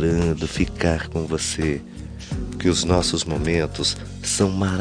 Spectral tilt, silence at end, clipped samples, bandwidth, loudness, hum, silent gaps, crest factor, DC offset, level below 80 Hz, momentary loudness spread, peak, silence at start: -4.5 dB/octave; 0 s; under 0.1%; 10.5 kHz; -22 LUFS; none; none; 18 dB; under 0.1%; -34 dBFS; 11 LU; -4 dBFS; 0 s